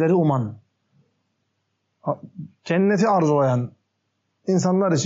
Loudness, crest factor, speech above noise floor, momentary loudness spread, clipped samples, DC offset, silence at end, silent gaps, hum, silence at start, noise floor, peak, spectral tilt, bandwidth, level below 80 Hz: -21 LUFS; 14 dB; 54 dB; 15 LU; under 0.1%; under 0.1%; 0 s; none; none; 0 s; -74 dBFS; -10 dBFS; -7 dB/octave; 7.6 kHz; -70 dBFS